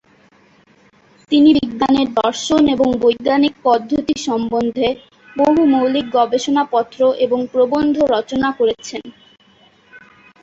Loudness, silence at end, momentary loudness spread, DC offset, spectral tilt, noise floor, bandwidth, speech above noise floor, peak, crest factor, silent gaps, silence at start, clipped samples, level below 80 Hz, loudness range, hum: -16 LUFS; 0.45 s; 7 LU; under 0.1%; -4.5 dB/octave; -51 dBFS; 8 kHz; 36 dB; -2 dBFS; 16 dB; none; 1.3 s; under 0.1%; -50 dBFS; 3 LU; none